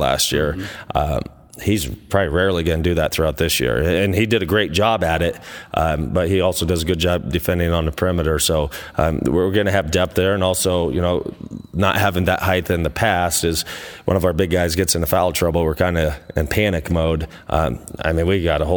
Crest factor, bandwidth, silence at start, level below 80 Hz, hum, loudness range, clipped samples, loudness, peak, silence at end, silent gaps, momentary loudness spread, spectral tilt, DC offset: 18 dB; over 20 kHz; 0 s; -34 dBFS; none; 1 LU; under 0.1%; -19 LUFS; 0 dBFS; 0 s; none; 6 LU; -4.5 dB/octave; under 0.1%